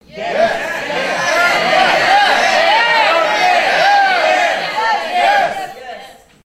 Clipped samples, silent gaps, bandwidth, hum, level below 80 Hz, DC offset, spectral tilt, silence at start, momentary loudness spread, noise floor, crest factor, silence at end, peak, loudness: under 0.1%; none; 15.5 kHz; none; -52 dBFS; under 0.1%; -1.5 dB/octave; 0.15 s; 9 LU; -37 dBFS; 14 dB; 0.35 s; 0 dBFS; -12 LUFS